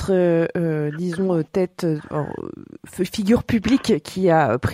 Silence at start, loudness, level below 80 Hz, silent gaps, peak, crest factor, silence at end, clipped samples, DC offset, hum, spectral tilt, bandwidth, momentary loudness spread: 0 s; -21 LUFS; -46 dBFS; none; -6 dBFS; 16 dB; 0 s; under 0.1%; under 0.1%; none; -7 dB/octave; 16 kHz; 11 LU